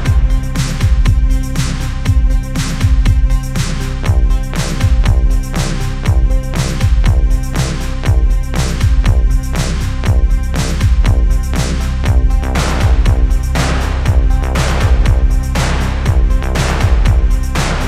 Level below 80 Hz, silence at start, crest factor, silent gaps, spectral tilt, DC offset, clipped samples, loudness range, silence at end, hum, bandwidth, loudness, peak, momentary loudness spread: -12 dBFS; 0 s; 12 dB; none; -5.5 dB/octave; under 0.1%; under 0.1%; 2 LU; 0 s; none; 13.5 kHz; -15 LUFS; 0 dBFS; 5 LU